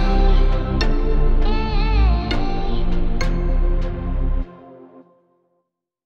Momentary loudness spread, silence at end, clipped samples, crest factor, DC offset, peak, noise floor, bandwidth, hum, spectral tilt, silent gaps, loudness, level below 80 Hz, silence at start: 7 LU; 1.35 s; under 0.1%; 12 dB; under 0.1%; -6 dBFS; -73 dBFS; 6.8 kHz; none; -7 dB/octave; none; -22 LUFS; -18 dBFS; 0 s